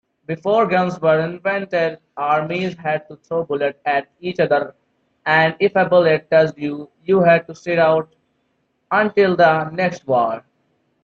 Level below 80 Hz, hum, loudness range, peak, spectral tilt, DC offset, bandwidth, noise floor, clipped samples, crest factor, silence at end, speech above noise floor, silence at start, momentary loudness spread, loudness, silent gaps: -62 dBFS; none; 5 LU; -2 dBFS; -7 dB/octave; under 0.1%; 7.2 kHz; -67 dBFS; under 0.1%; 16 dB; 0.65 s; 50 dB; 0.3 s; 11 LU; -18 LUFS; none